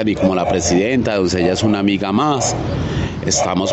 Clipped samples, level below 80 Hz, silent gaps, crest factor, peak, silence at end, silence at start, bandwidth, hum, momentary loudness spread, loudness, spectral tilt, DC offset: under 0.1%; -36 dBFS; none; 14 dB; -2 dBFS; 0 s; 0 s; 8.6 kHz; none; 5 LU; -17 LUFS; -4.5 dB/octave; under 0.1%